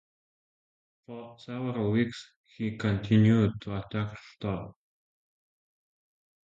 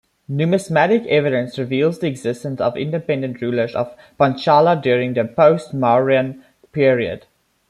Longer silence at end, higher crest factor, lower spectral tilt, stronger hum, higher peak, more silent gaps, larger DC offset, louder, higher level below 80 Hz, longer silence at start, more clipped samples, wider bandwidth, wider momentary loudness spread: first, 1.75 s vs 0.5 s; about the same, 20 dB vs 16 dB; about the same, -8 dB/octave vs -7 dB/octave; neither; second, -12 dBFS vs -2 dBFS; first, 2.36-2.44 s vs none; neither; second, -29 LUFS vs -18 LUFS; about the same, -56 dBFS vs -60 dBFS; first, 1.1 s vs 0.3 s; neither; second, 7.6 kHz vs 12 kHz; first, 21 LU vs 10 LU